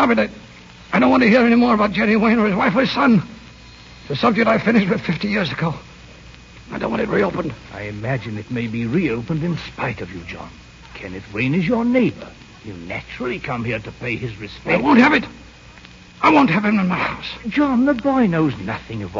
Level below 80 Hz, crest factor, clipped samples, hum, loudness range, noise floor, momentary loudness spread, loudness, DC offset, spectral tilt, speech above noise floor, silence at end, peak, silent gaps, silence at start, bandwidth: -46 dBFS; 18 dB; under 0.1%; none; 8 LU; -42 dBFS; 18 LU; -18 LUFS; under 0.1%; -7 dB/octave; 24 dB; 0 s; -2 dBFS; none; 0 s; 7.6 kHz